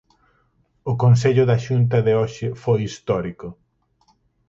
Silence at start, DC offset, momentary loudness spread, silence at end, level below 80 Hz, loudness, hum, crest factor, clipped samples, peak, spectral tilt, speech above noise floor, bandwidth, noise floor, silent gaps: 0.85 s; under 0.1%; 16 LU; 1 s; -50 dBFS; -19 LUFS; none; 16 dB; under 0.1%; -4 dBFS; -7.5 dB/octave; 45 dB; 7.8 kHz; -63 dBFS; none